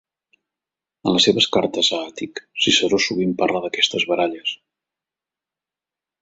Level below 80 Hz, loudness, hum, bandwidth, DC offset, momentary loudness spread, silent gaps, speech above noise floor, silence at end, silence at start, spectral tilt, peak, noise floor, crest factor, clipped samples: -60 dBFS; -18 LUFS; none; 8 kHz; under 0.1%; 12 LU; none; 69 dB; 1.65 s; 1.05 s; -3 dB/octave; -2 dBFS; -89 dBFS; 20 dB; under 0.1%